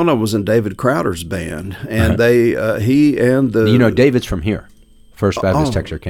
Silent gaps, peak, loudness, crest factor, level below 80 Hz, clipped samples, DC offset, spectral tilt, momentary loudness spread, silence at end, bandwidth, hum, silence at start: none; -2 dBFS; -15 LUFS; 14 dB; -34 dBFS; under 0.1%; under 0.1%; -7 dB/octave; 11 LU; 0 s; 17 kHz; none; 0 s